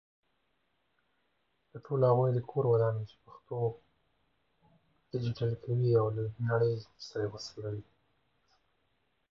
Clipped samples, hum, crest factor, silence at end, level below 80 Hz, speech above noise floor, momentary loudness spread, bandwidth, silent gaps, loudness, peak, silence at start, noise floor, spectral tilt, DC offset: under 0.1%; none; 18 dB; 1.5 s; -66 dBFS; 47 dB; 14 LU; 7.2 kHz; none; -32 LUFS; -16 dBFS; 1.75 s; -78 dBFS; -8 dB/octave; under 0.1%